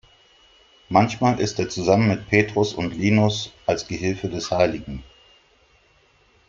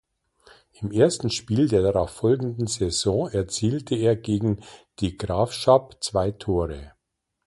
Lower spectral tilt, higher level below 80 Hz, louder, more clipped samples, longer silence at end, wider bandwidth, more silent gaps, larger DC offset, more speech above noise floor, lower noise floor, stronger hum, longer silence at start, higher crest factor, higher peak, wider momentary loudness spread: about the same, -5.5 dB/octave vs -5.5 dB/octave; second, -50 dBFS vs -44 dBFS; first, -21 LUFS vs -24 LUFS; neither; first, 1.45 s vs 0.6 s; second, 7.6 kHz vs 11.5 kHz; neither; neither; second, 38 dB vs 56 dB; second, -59 dBFS vs -79 dBFS; neither; about the same, 0.9 s vs 0.8 s; about the same, 20 dB vs 20 dB; about the same, -2 dBFS vs -4 dBFS; about the same, 7 LU vs 9 LU